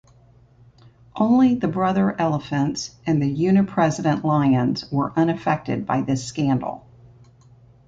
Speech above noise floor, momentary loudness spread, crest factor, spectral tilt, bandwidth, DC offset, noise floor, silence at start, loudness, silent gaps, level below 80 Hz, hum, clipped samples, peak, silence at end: 32 dB; 7 LU; 16 dB; -7 dB/octave; 7.8 kHz; under 0.1%; -53 dBFS; 1.15 s; -21 LUFS; none; -54 dBFS; none; under 0.1%; -6 dBFS; 1.1 s